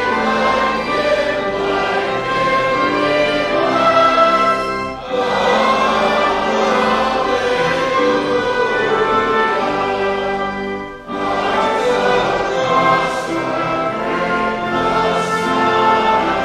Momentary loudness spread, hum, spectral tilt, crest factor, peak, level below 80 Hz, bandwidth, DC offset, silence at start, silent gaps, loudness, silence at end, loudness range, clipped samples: 6 LU; none; -4.5 dB/octave; 14 dB; -2 dBFS; -42 dBFS; 13.5 kHz; under 0.1%; 0 s; none; -16 LUFS; 0 s; 3 LU; under 0.1%